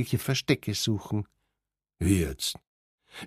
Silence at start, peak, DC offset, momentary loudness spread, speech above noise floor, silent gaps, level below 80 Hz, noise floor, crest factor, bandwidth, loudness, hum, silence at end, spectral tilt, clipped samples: 0 s; -8 dBFS; under 0.1%; 15 LU; 58 dB; 2.67-2.98 s; -48 dBFS; -86 dBFS; 22 dB; 15.5 kHz; -28 LUFS; none; 0 s; -5 dB/octave; under 0.1%